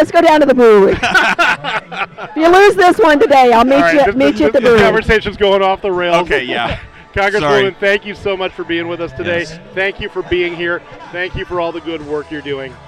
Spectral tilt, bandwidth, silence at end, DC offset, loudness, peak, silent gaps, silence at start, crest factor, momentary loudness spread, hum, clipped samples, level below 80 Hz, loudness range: -5 dB/octave; 15.5 kHz; 0.15 s; under 0.1%; -12 LUFS; -2 dBFS; none; 0 s; 10 dB; 14 LU; none; under 0.1%; -36 dBFS; 10 LU